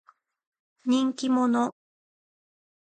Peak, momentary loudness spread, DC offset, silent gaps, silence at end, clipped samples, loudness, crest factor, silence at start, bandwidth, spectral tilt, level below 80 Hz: -14 dBFS; 7 LU; under 0.1%; none; 1.15 s; under 0.1%; -26 LUFS; 14 dB; 0.85 s; 9.2 kHz; -4.5 dB/octave; -80 dBFS